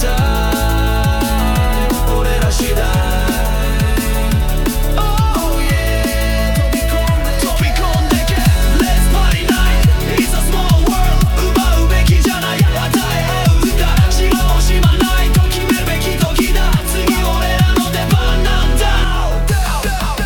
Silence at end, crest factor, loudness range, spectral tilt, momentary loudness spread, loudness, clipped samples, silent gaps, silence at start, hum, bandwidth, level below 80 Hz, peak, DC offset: 0 s; 12 dB; 2 LU; -5 dB/octave; 3 LU; -15 LUFS; under 0.1%; none; 0 s; none; 19 kHz; -14 dBFS; 0 dBFS; under 0.1%